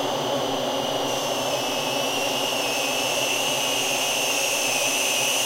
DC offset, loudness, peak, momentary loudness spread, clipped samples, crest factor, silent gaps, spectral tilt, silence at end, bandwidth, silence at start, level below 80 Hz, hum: under 0.1%; -22 LUFS; -10 dBFS; 4 LU; under 0.1%; 14 dB; none; -1 dB/octave; 0 s; 16 kHz; 0 s; -60 dBFS; none